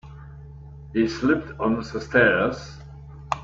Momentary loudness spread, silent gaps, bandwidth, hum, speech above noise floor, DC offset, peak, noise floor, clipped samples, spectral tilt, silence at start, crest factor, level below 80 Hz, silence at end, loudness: 24 LU; none; 7.8 kHz; none; 19 dB; under 0.1%; -4 dBFS; -41 dBFS; under 0.1%; -6 dB/octave; 0.05 s; 20 dB; -46 dBFS; 0 s; -23 LUFS